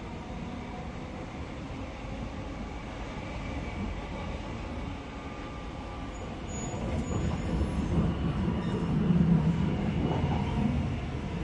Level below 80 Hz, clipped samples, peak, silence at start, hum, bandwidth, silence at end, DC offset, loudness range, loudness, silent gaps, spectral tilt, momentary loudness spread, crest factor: -40 dBFS; under 0.1%; -12 dBFS; 0 s; none; 11 kHz; 0 s; under 0.1%; 10 LU; -33 LUFS; none; -7 dB/octave; 12 LU; 18 dB